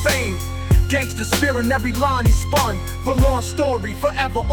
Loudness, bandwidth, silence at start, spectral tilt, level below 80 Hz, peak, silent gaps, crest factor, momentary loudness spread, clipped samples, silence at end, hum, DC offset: -19 LUFS; 19.5 kHz; 0 s; -5 dB/octave; -24 dBFS; -4 dBFS; none; 14 dB; 5 LU; under 0.1%; 0 s; none; under 0.1%